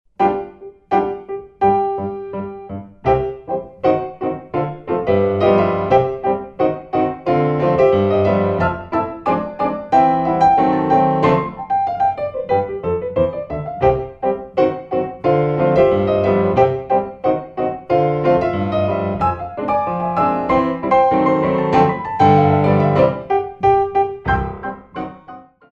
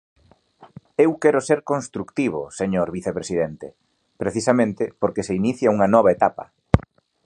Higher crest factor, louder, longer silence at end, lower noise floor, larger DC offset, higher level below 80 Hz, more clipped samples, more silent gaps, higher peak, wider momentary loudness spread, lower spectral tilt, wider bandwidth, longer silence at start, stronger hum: second, 16 dB vs 22 dB; first, -17 LUFS vs -21 LUFS; second, 0.3 s vs 0.45 s; second, -40 dBFS vs -52 dBFS; neither; about the same, -42 dBFS vs -40 dBFS; neither; neither; about the same, -2 dBFS vs 0 dBFS; about the same, 10 LU vs 12 LU; first, -9 dB/octave vs -6.5 dB/octave; second, 7 kHz vs 11 kHz; second, 0.2 s vs 0.6 s; neither